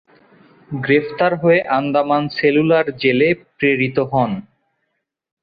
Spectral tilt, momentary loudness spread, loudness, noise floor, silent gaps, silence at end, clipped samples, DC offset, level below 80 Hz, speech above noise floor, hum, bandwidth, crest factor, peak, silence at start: -9.5 dB/octave; 5 LU; -17 LUFS; -73 dBFS; none; 1 s; under 0.1%; under 0.1%; -56 dBFS; 57 dB; none; 5 kHz; 16 dB; -2 dBFS; 0.7 s